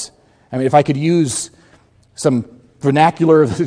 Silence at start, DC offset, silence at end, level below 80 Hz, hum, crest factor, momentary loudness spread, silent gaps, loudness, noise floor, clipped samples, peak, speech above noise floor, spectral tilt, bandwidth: 0 s; under 0.1%; 0 s; -52 dBFS; none; 16 dB; 15 LU; none; -15 LUFS; -51 dBFS; under 0.1%; 0 dBFS; 37 dB; -6 dB/octave; 11 kHz